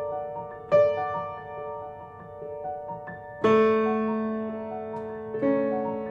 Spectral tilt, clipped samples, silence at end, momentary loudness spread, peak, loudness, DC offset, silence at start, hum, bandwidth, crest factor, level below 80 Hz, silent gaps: -8 dB/octave; under 0.1%; 0 s; 17 LU; -10 dBFS; -27 LUFS; under 0.1%; 0 s; none; 7.2 kHz; 18 dB; -62 dBFS; none